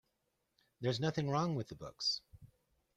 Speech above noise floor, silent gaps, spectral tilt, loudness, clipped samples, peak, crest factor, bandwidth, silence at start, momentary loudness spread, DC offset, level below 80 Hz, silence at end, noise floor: 46 dB; none; -5.5 dB/octave; -38 LUFS; under 0.1%; -22 dBFS; 18 dB; 11.5 kHz; 0.8 s; 7 LU; under 0.1%; -70 dBFS; 0.5 s; -83 dBFS